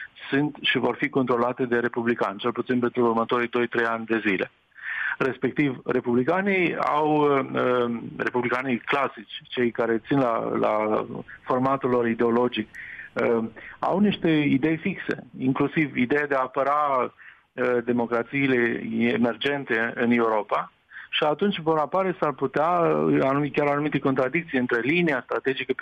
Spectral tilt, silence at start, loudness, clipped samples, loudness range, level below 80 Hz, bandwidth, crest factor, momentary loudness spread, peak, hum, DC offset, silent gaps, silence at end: -7.5 dB/octave; 0 s; -24 LUFS; under 0.1%; 2 LU; -64 dBFS; 8.2 kHz; 14 dB; 7 LU; -10 dBFS; none; under 0.1%; none; 0 s